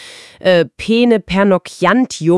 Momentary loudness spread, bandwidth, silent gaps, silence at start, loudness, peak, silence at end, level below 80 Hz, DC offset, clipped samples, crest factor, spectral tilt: 2 LU; 12 kHz; none; 0 s; -14 LUFS; 0 dBFS; 0 s; -44 dBFS; under 0.1%; under 0.1%; 14 dB; -5.5 dB/octave